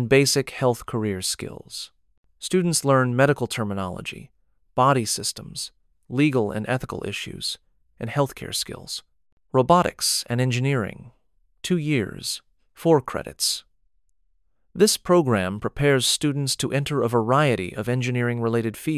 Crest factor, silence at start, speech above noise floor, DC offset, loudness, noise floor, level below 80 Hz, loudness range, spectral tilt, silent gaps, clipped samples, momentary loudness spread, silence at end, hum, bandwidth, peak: 20 dB; 0 s; 48 dB; under 0.1%; -23 LUFS; -71 dBFS; -52 dBFS; 5 LU; -4.5 dB/octave; 2.18-2.24 s, 9.32-9.37 s; under 0.1%; 14 LU; 0 s; none; 16 kHz; -4 dBFS